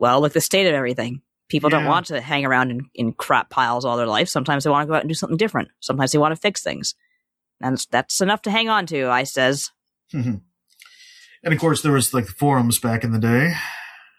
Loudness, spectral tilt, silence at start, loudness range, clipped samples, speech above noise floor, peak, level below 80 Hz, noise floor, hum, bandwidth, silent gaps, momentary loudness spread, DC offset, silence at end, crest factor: -20 LUFS; -4.5 dB/octave; 0 s; 2 LU; under 0.1%; 53 dB; -2 dBFS; -60 dBFS; -73 dBFS; none; 15.5 kHz; none; 9 LU; under 0.1%; 0.2 s; 18 dB